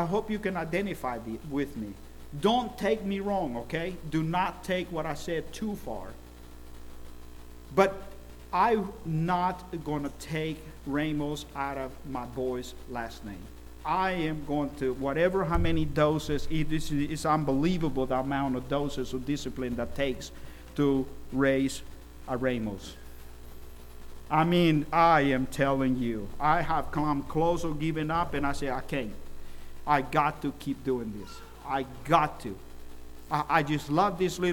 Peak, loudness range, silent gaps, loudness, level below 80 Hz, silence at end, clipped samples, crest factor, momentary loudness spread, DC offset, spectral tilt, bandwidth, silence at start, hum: -8 dBFS; 7 LU; none; -29 LUFS; -44 dBFS; 0 s; under 0.1%; 22 dB; 22 LU; under 0.1%; -6 dB/octave; 18.5 kHz; 0 s; 60 Hz at -50 dBFS